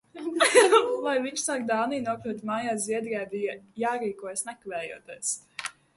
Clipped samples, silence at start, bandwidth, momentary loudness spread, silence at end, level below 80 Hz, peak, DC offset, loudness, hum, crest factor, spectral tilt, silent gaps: under 0.1%; 0.15 s; 12 kHz; 15 LU; 0.25 s; -72 dBFS; -6 dBFS; under 0.1%; -27 LUFS; none; 22 dB; -2 dB/octave; none